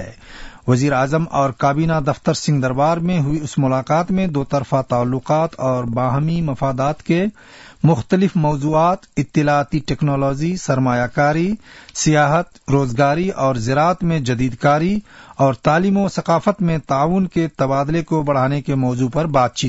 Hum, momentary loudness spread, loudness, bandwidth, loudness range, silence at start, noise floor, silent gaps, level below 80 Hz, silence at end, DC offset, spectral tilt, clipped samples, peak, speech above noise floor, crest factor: none; 5 LU; -18 LUFS; 8 kHz; 1 LU; 0 s; -36 dBFS; none; -42 dBFS; 0 s; under 0.1%; -6.5 dB/octave; under 0.1%; -4 dBFS; 19 dB; 14 dB